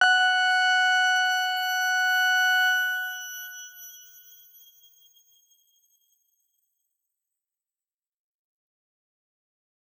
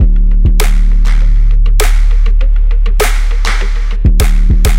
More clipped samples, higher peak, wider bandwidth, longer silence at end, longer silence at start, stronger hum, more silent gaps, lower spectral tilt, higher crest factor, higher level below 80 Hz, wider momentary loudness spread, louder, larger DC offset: neither; second, -8 dBFS vs 0 dBFS; first, over 20 kHz vs 16 kHz; first, 6 s vs 0 s; about the same, 0 s vs 0 s; neither; neither; second, 5.5 dB/octave vs -5 dB/octave; first, 20 dB vs 6 dB; second, under -90 dBFS vs -6 dBFS; first, 19 LU vs 3 LU; second, -22 LUFS vs -13 LUFS; second, under 0.1% vs 2%